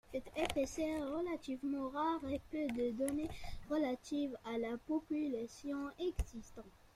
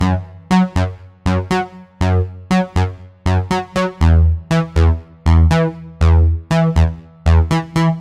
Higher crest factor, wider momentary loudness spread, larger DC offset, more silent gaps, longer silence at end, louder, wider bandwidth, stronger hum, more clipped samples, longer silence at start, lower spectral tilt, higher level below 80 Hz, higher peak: first, 20 dB vs 14 dB; about the same, 7 LU vs 8 LU; neither; neither; first, 0.2 s vs 0 s; second, -40 LUFS vs -16 LUFS; first, 15 kHz vs 9.6 kHz; neither; neither; about the same, 0.1 s vs 0 s; second, -5.5 dB/octave vs -7.5 dB/octave; second, -54 dBFS vs -24 dBFS; second, -20 dBFS vs 0 dBFS